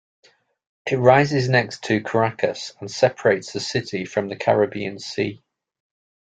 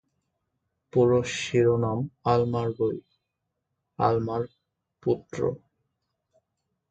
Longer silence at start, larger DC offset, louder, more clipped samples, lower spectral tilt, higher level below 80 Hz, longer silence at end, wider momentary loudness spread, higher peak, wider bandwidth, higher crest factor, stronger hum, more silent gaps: about the same, 0.85 s vs 0.95 s; neither; first, -21 LUFS vs -26 LUFS; neither; about the same, -5.5 dB/octave vs -6.5 dB/octave; about the same, -60 dBFS vs -58 dBFS; second, 0.9 s vs 1.35 s; about the same, 12 LU vs 10 LU; first, 0 dBFS vs -8 dBFS; about the same, 9.2 kHz vs 9 kHz; about the same, 22 dB vs 20 dB; neither; neither